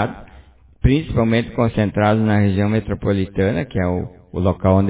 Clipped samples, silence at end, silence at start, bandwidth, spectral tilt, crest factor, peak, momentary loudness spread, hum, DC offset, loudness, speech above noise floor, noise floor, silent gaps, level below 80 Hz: under 0.1%; 0 s; 0 s; 4 kHz; -12 dB/octave; 16 dB; -2 dBFS; 6 LU; none; under 0.1%; -19 LUFS; 28 dB; -46 dBFS; none; -32 dBFS